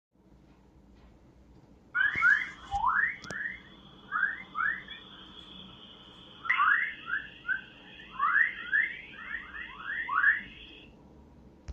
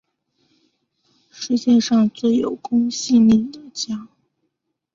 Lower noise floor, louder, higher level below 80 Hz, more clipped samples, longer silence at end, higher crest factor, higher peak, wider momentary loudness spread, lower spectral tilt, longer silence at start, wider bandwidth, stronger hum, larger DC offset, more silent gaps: second, -59 dBFS vs -75 dBFS; second, -29 LUFS vs -18 LUFS; about the same, -60 dBFS vs -58 dBFS; neither; second, 0 s vs 0.9 s; first, 20 dB vs 14 dB; second, -12 dBFS vs -6 dBFS; first, 23 LU vs 14 LU; second, -3 dB/octave vs -5 dB/octave; first, 1.95 s vs 1.35 s; first, 9 kHz vs 7.6 kHz; neither; neither; neither